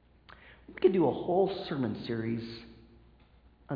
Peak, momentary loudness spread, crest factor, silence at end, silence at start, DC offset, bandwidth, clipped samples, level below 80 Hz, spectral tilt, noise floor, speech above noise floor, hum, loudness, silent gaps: -12 dBFS; 17 LU; 20 dB; 0 s; 0.45 s; under 0.1%; 5.2 kHz; under 0.1%; -60 dBFS; -6 dB/octave; -60 dBFS; 31 dB; none; -30 LUFS; none